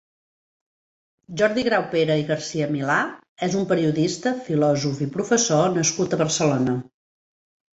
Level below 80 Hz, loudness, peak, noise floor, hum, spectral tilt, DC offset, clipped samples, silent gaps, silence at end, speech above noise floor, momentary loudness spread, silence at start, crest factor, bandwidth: -60 dBFS; -22 LUFS; -6 dBFS; under -90 dBFS; none; -4.5 dB/octave; under 0.1%; under 0.1%; 3.29-3.36 s; 0.9 s; over 69 dB; 6 LU; 1.3 s; 18 dB; 8.2 kHz